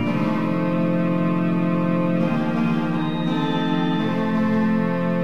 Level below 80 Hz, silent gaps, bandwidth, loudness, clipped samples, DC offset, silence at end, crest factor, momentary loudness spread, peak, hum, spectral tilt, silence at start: -52 dBFS; none; 6.4 kHz; -21 LUFS; under 0.1%; 2%; 0 s; 12 dB; 2 LU; -10 dBFS; none; -8.5 dB/octave; 0 s